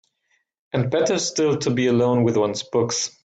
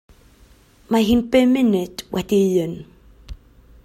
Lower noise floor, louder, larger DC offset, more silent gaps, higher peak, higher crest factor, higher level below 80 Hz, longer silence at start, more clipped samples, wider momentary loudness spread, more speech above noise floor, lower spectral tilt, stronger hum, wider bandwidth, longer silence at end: first, -69 dBFS vs -51 dBFS; about the same, -21 LUFS vs -19 LUFS; neither; neither; second, -8 dBFS vs -4 dBFS; about the same, 14 dB vs 16 dB; second, -60 dBFS vs -44 dBFS; second, 0.75 s vs 0.9 s; neither; second, 5 LU vs 11 LU; first, 49 dB vs 33 dB; about the same, -5 dB/octave vs -6 dB/octave; neither; second, 9.2 kHz vs 16 kHz; second, 0.15 s vs 0.5 s